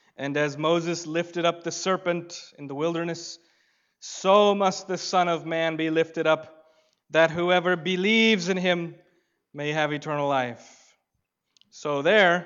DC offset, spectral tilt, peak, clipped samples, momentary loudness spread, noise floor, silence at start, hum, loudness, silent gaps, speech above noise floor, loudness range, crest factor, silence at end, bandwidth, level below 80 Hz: under 0.1%; -4.5 dB/octave; -6 dBFS; under 0.1%; 16 LU; -79 dBFS; 0.2 s; none; -24 LUFS; none; 54 dB; 6 LU; 20 dB; 0 s; 7.8 kHz; -76 dBFS